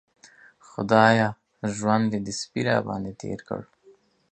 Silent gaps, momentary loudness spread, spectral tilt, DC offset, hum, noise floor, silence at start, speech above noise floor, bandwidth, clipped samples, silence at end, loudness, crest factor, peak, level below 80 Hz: none; 17 LU; -5.5 dB/octave; under 0.1%; none; -58 dBFS; 0.8 s; 34 dB; 9.4 kHz; under 0.1%; 0.7 s; -24 LUFS; 24 dB; -2 dBFS; -60 dBFS